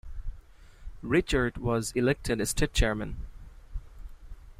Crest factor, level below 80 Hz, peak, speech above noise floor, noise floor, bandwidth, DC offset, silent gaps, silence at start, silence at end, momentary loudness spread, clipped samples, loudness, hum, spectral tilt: 20 dB; -38 dBFS; -12 dBFS; 23 dB; -50 dBFS; 15.5 kHz; under 0.1%; none; 0.05 s; 0.05 s; 19 LU; under 0.1%; -28 LUFS; none; -5 dB/octave